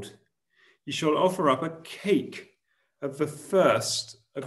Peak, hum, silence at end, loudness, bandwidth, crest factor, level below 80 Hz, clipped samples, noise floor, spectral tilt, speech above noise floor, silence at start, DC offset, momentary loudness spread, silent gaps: -8 dBFS; none; 0 s; -26 LUFS; 13 kHz; 20 dB; -72 dBFS; under 0.1%; -73 dBFS; -4.5 dB/octave; 47 dB; 0 s; under 0.1%; 17 LU; none